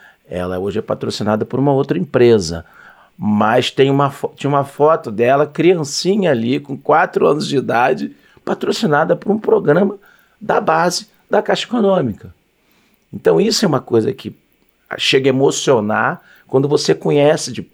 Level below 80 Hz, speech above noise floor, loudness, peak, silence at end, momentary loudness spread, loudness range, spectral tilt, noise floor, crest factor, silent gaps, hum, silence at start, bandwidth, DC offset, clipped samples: -54 dBFS; 43 dB; -16 LUFS; -2 dBFS; 0.1 s; 10 LU; 3 LU; -5 dB/octave; -58 dBFS; 14 dB; none; none; 0.3 s; 15.5 kHz; under 0.1%; under 0.1%